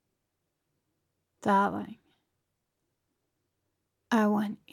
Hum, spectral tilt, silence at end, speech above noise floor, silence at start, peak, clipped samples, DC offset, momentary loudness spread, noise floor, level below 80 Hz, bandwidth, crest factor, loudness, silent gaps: none; -6.5 dB/octave; 0.2 s; 55 dB; 1.45 s; -14 dBFS; under 0.1%; under 0.1%; 12 LU; -82 dBFS; -76 dBFS; 14.5 kHz; 20 dB; -28 LUFS; none